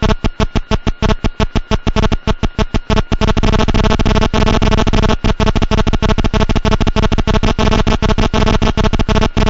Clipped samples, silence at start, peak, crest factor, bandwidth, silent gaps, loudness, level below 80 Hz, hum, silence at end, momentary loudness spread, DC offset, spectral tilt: under 0.1%; 0 s; -2 dBFS; 10 dB; 7.8 kHz; none; -15 LUFS; -16 dBFS; none; 0 s; 4 LU; 2%; -6 dB/octave